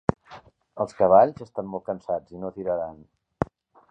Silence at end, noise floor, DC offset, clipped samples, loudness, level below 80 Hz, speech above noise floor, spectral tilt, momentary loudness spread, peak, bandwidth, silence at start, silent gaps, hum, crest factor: 0.45 s; -49 dBFS; under 0.1%; under 0.1%; -25 LUFS; -52 dBFS; 25 dB; -8.5 dB/octave; 17 LU; -2 dBFS; 8.6 kHz; 0.3 s; none; none; 24 dB